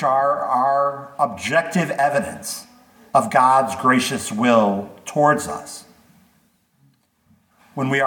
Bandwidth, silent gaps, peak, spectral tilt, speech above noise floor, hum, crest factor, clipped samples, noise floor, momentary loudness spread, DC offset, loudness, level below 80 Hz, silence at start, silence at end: 19 kHz; none; -2 dBFS; -4.5 dB/octave; 42 dB; none; 18 dB; under 0.1%; -61 dBFS; 14 LU; under 0.1%; -19 LUFS; -62 dBFS; 0 s; 0 s